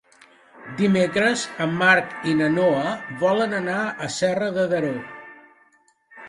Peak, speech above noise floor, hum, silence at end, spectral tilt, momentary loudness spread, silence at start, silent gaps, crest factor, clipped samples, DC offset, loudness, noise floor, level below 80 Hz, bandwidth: -4 dBFS; 39 dB; none; 0 s; -5 dB/octave; 10 LU; 0.55 s; none; 20 dB; under 0.1%; under 0.1%; -21 LUFS; -60 dBFS; -64 dBFS; 11.5 kHz